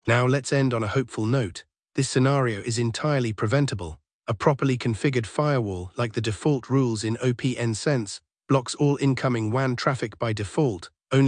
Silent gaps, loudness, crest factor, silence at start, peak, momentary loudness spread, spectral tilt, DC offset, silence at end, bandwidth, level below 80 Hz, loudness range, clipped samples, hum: 4.13-4.20 s; -25 LUFS; 20 dB; 0.05 s; -4 dBFS; 7 LU; -6 dB/octave; under 0.1%; 0 s; 10.5 kHz; -58 dBFS; 1 LU; under 0.1%; none